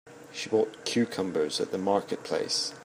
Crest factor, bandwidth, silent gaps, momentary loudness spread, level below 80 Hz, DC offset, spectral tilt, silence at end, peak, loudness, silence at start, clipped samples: 18 dB; 15.5 kHz; none; 4 LU; -76 dBFS; under 0.1%; -3.5 dB/octave; 0 s; -12 dBFS; -29 LUFS; 0.05 s; under 0.1%